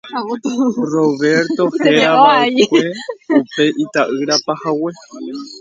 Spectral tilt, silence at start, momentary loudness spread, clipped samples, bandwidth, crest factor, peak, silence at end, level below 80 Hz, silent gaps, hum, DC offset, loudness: -4.5 dB/octave; 0.05 s; 14 LU; under 0.1%; 7.8 kHz; 14 dB; 0 dBFS; 0 s; -64 dBFS; none; none; under 0.1%; -14 LUFS